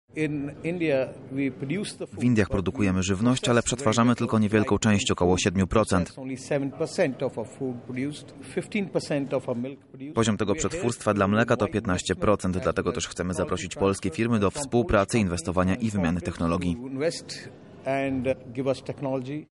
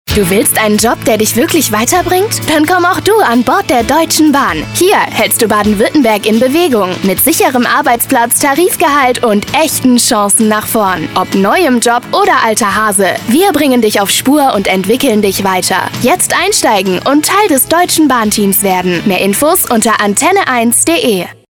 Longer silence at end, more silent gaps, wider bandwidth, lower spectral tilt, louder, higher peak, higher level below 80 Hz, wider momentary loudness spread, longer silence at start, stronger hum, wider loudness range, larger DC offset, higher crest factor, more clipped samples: about the same, 0.1 s vs 0.2 s; neither; second, 11.5 kHz vs over 20 kHz; first, -5.5 dB/octave vs -3 dB/octave; second, -26 LUFS vs -9 LUFS; second, -8 dBFS vs 0 dBFS; second, -48 dBFS vs -38 dBFS; first, 10 LU vs 3 LU; about the same, 0.15 s vs 0.05 s; neither; first, 6 LU vs 1 LU; neither; first, 18 dB vs 10 dB; neither